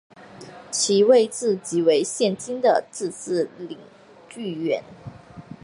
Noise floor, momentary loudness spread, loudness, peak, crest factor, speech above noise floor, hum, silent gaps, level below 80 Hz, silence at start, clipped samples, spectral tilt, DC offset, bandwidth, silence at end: -43 dBFS; 25 LU; -22 LUFS; -4 dBFS; 18 dB; 21 dB; none; none; -66 dBFS; 0.2 s; under 0.1%; -4 dB/octave; under 0.1%; 11.5 kHz; 0.1 s